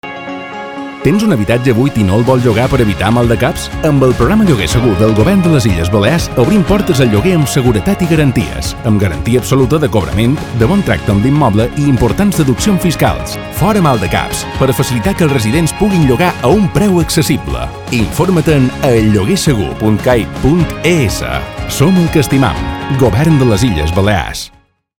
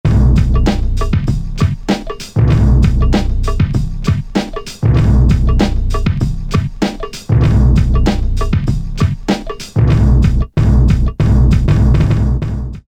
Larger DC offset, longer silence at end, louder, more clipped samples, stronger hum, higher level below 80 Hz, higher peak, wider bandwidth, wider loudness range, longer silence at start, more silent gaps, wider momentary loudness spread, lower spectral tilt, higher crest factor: neither; first, 0.5 s vs 0.1 s; first, -11 LUFS vs -14 LUFS; first, 0.4% vs under 0.1%; neither; second, -26 dBFS vs -14 dBFS; about the same, 0 dBFS vs 0 dBFS; first, 18.5 kHz vs 9.6 kHz; about the same, 2 LU vs 2 LU; about the same, 0.05 s vs 0.05 s; neither; about the same, 6 LU vs 8 LU; second, -6 dB/octave vs -7.5 dB/octave; about the same, 10 dB vs 12 dB